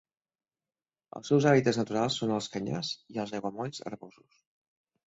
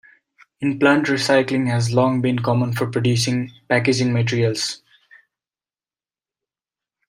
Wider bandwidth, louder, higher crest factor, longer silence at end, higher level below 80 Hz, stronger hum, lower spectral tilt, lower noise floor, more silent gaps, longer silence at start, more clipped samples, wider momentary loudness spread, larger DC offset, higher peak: second, 8 kHz vs 15.5 kHz; second, -29 LUFS vs -19 LUFS; about the same, 22 dB vs 18 dB; second, 0.95 s vs 2.35 s; second, -68 dBFS vs -60 dBFS; neither; about the same, -5.5 dB/octave vs -5.5 dB/octave; about the same, under -90 dBFS vs under -90 dBFS; neither; first, 1.15 s vs 0.6 s; neither; first, 19 LU vs 8 LU; neither; second, -10 dBFS vs -2 dBFS